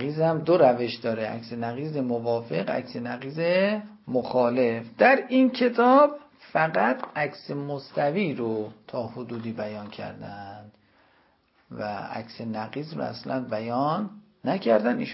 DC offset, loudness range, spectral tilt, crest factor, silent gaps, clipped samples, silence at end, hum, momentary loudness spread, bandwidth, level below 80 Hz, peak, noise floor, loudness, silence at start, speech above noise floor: under 0.1%; 15 LU; -10.5 dB/octave; 20 dB; none; under 0.1%; 0 s; none; 15 LU; 5.8 kHz; -70 dBFS; -6 dBFS; -64 dBFS; -25 LUFS; 0 s; 39 dB